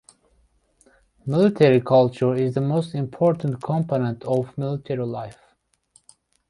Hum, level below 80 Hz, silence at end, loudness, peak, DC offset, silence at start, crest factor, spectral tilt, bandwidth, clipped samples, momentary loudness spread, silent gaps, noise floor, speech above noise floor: none; -60 dBFS; 1.2 s; -22 LUFS; -2 dBFS; under 0.1%; 1.25 s; 20 dB; -8.5 dB/octave; 11.5 kHz; under 0.1%; 12 LU; none; -65 dBFS; 44 dB